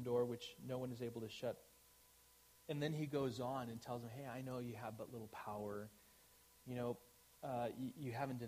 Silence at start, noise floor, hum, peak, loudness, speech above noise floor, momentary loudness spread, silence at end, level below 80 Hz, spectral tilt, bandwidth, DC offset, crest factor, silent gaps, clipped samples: 0 s; -69 dBFS; none; -28 dBFS; -47 LUFS; 24 dB; 24 LU; 0 s; -76 dBFS; -6.5 dB/octave; 15.5 kHz; under 0.1%; 18 dB; none; under 0.1%